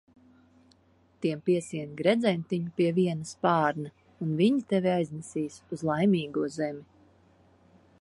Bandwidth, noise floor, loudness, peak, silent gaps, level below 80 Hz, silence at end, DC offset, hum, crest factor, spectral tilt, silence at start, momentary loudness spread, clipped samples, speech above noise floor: 11.5 kHz; -63 dBFS; -28 LUFS; -10 dBFS; none; -68 dBFS; 1.15 s; under 0.1%; none; 20 dB; -6.5 dB/octave; 1.2 s; 10 LU; under 0.1%; 36 dB